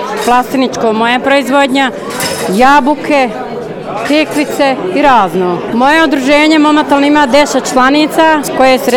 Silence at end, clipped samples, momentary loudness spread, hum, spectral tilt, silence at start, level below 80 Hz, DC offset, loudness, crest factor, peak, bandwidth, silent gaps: 0 s; 0.4%; 7 LU; none; -4 dB/octave; 0 s; -42 dBFS; under 0.1%; -9 LUFS; 10 dB; 0 dBFS; 18 kHz; none